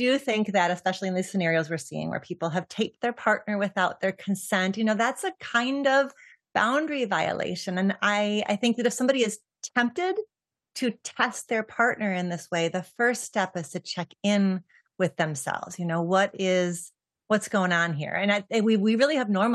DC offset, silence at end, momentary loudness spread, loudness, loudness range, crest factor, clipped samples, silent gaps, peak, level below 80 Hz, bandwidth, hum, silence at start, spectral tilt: under 0.1%; 0 s; 8 LU; -26 LUFS; 2 LU; 20 dB; under 0.1%; none; -6 dBFS; -78 dBFS; 12.5 kHz; none; 0 s; -4.5 dB/octave